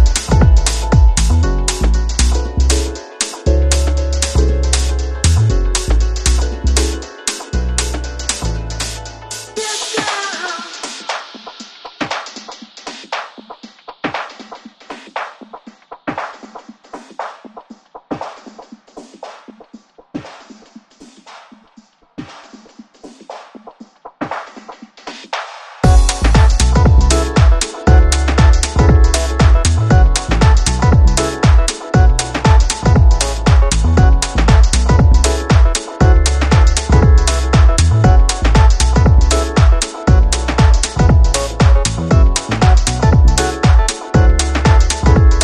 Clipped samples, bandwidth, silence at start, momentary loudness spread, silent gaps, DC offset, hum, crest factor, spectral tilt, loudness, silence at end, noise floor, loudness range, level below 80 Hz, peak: under 0.1%; 12 kHz; 0 s; 19 LU; none; under 0.1%; none; 12 dB; -5 dB/octave; -13 LUFS; 0 s; -48 dBFS; 18 LU; -14 dBFS; 0 dBFS